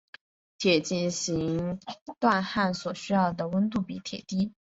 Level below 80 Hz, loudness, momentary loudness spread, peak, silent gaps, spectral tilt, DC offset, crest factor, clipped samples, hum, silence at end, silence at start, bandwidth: -60 dBFS; -28 LUFS; 9 LU; -8 dBFS; 2.01-2.06 s; -5 dB/octave; under 0.1%; 20 dB; under 0.1%; none; 0.25 s; 0.6 s; 8 kHz